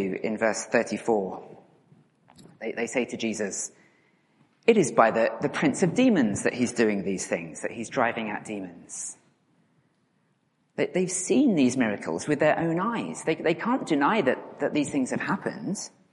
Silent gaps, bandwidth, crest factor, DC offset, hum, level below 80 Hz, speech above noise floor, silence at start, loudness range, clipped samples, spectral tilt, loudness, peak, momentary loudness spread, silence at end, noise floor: none; 11.5 kHz; 24 dB; under 0.1%; none; -68 dBFS; 44 dB; 0 s; 9 LU; under 0.1%; -5 dB/octave; -26 LUFS; -4 dBFS; 13 LU; 0.25 s; -70 dBFS